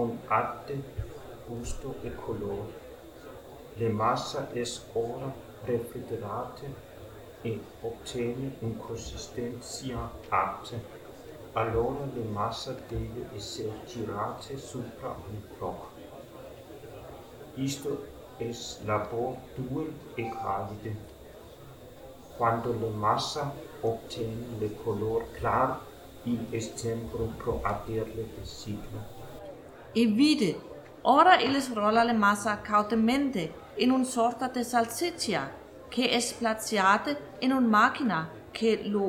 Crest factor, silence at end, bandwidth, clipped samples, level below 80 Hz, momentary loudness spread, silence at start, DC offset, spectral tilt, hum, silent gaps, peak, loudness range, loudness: 24 dB; 0 s; 18 kHz; under 0.1%; -52 dBFS; 21 LU; 0 s; under 0.1%; -5 dB/octave; none; none; -8 dBFS; 13 LU; -30 LUFS